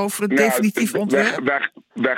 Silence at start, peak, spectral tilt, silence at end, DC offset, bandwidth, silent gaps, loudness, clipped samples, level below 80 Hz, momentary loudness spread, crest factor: 0 s; -4 dBFS; -4.5 dB/octave; 0 s; under 0.1%; 17 kHz; none; -19 LUFS; under 0.1%; -68 dBFS; 6 LU; 16 dB